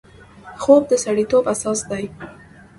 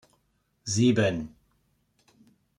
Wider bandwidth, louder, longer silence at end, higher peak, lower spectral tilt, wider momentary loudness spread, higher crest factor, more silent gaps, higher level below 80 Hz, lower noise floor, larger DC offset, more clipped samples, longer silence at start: about the same, 11.5 kHz vs 11.5 kHz; first, -18 LUFS vs -25 LUFS; second, 0.45 s vs 1.3 s; first, 0 dBFS vs -12 dBFS; about the same, -4.5 dB/octave vs -5 dB/octave; about the same, 18 LU vs 19 LU; about the same, 20 dB vs 18 dB; neither; first, -52 dBFS vs -60 dBFS; second, -42 dBFS vs -72 dBFS; neither; neither; second, 0.45 s vs 0.65 s